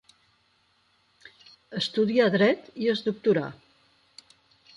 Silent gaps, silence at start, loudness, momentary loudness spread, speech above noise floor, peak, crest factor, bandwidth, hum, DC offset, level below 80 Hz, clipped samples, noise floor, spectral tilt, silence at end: none; 1.7 s; -25 LUFS; 9 LU; 43 dB; -10 dBFS; 20 dB; 11 kHz; none; under 0.1%; -70 dBFS; under 0.1%; -67 dBFS; -6 dB/octave; 1.25 s